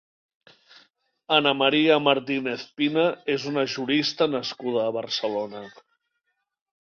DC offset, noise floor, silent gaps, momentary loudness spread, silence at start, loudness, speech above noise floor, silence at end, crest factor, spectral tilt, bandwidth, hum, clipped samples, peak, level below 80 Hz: under 0.1%; -77 dBFS; none; 10 LU; 1.3 s; -23 LUFS; 54 dB; 1.2 s; 22 dB; -4.5 dB/octave; 7.2 kHz; none; under 0.1%; -4 dBFS; -72 dBFS